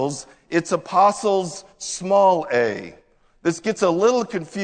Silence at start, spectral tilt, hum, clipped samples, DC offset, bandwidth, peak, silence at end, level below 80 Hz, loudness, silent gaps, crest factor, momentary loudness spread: 0 s; -4.5 dB/octave; none; under 0.1%; under 0.1%; 9.4 kHz; -4 dBFS; 0 s; -60 dBFS; -20 LUFS; none; 18 dB; 14 LU